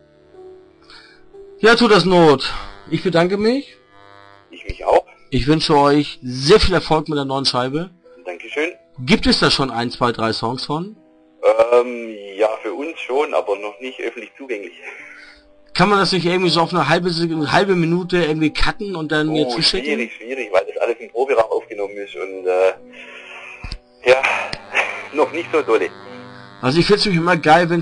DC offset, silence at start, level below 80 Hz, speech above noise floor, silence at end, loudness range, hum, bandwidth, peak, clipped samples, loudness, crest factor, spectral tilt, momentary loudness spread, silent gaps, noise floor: under 0.1%; 0.4 s; -38 dBFS; 29 dB; 0 s; 5 LU; none; 10.5 kHz; -4 dBFS; under 0.1%; -17 LUFS; 16 dB; -5 dB/octave; 19 LU; none; -46 dBFS